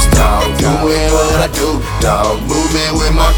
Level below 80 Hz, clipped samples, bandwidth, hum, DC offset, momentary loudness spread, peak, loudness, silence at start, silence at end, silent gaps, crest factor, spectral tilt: -16 dBFS; under 0.1%; over 20 kHz; none; under 0.1%; 4 LU; 0 dBFS; -13 LUFS; 0 s; 0 s; none; 12 dB; -4.5 dB/octave